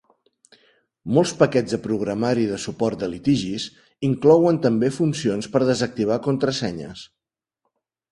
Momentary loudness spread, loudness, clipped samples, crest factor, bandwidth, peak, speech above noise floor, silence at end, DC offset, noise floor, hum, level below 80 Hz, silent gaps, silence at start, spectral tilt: 12 LU; -21 LUFS; under 0.1%; 20 dB; 11.5 kHz; -2 dBFS; 58 dB; 1.05 s; under 0.1%; -78 dBFS; none; -56 dBFS; none; 1.05 s; -6 dB/octave